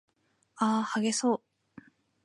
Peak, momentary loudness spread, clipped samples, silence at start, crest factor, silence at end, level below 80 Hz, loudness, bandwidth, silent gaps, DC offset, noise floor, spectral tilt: -14 dBFS; 4 LU; under 0.1%; 0.55 s; 18 dB; 0.85 s; -80 dBFS; -29 LUFS; 11.5 kHz; none; under 0.1%; -68 dBFS; -4 dB/octave